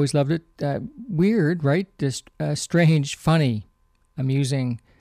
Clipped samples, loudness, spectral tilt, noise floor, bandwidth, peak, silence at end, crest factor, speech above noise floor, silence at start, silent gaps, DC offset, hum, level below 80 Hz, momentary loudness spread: under 0.1%; -23 LUFS; -6.5 dB/octave; -57 dBFS; 13.5 kHz; -10 dBFS; 0.25 s; 14 dB; 36 dB; 0 s; none; under 0.1%; none; -54 dBFS; 10 LU